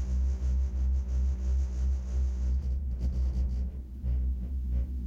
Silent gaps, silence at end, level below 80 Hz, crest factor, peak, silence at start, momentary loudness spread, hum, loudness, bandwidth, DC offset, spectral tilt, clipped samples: none; 0 s; -30 dBFS; 8 dB; -22 dBFS; 0 s; 4 LU; none; -32 LUFS; 7 kHz; under 0.1%; -8.5 dB/octave; under 0.1%